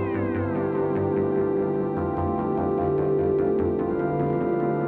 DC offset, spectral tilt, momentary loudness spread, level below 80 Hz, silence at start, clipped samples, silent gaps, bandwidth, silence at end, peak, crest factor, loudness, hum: under 0.1%; -11.5 dB/octave; 3 LU; -48 dBFS; 0 s; under 0.1%; none; 4.4 kHz; 0 s; -12 dBFS; 12 dB; -24 LUFS; none